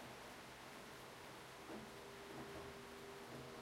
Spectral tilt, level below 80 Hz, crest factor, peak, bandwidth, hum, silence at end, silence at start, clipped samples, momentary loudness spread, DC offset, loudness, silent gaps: -4 dB/octave; -74 dBFS; 14 dB; -40 dBFS; 16 kHz; none; 0 s; 0 s; under 0.1%; 3 LU; under 0.1%; -54 LUFS; none